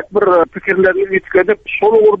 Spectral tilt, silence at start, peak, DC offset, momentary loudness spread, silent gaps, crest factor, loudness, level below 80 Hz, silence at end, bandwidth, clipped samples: -8 dB/octave; 0 s; 0 dBFS; under 0.1%; 5 LU; none; 12 dB; -13 LUFS; -48 dBFS; 0 s; 4 kHz; under 0.1%